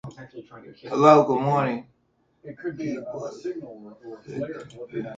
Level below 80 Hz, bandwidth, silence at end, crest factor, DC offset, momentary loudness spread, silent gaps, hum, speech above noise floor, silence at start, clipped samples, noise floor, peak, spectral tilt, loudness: -66 dBFS; 7.8 kHz; 0 s; 24 dB; under 0.1%; 27 LU; none; none; 43 dB; 0.05 s; under 0.1%; -68 dBFS; -2 dBFS; -7 dB/octave; -23 LUFS